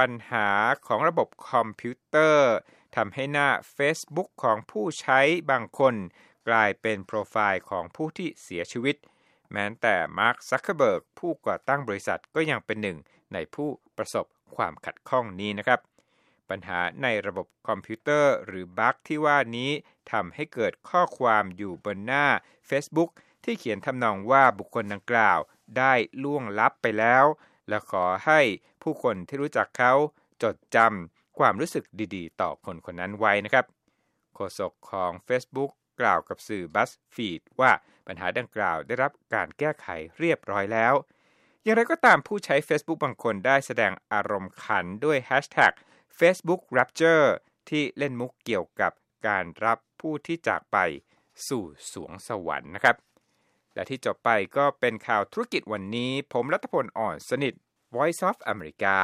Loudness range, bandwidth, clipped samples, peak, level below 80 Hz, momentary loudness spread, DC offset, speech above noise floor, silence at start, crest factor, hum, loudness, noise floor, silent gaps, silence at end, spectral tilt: 6 LU; 15 kHz; under 0.1%; -4 dBFS; -68 dBFS; 13 LU; under 0.1%; 47 dB; 0 s; 22 dB; none; -26 LUFS; -73 dBFS; none; 0 s; -5 dB/octave